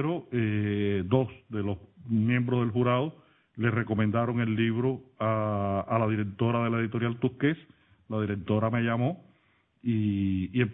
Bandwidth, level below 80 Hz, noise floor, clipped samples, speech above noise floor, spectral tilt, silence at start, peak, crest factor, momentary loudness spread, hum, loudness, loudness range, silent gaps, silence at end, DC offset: 3.9 kHz; -62 dBFS; -67 dBFS; under 0.1%; 40 dB; -11.5 dB/octave; 0 s; -12 dBFS; 16 dB; 7 LU; none; -29 LUFS; 2 LU; none; 0 s; under 0.1%